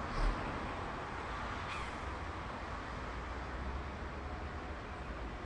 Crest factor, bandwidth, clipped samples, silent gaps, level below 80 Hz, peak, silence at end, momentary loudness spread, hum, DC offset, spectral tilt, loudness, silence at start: 18 dB; 10.5 kHz; under 0.1%; none; -44 dBFS; -24 dBFS; 0 s; 5 LU; none; under 0.1%; -5.5 dB/octave; -42 LUFS; 0 s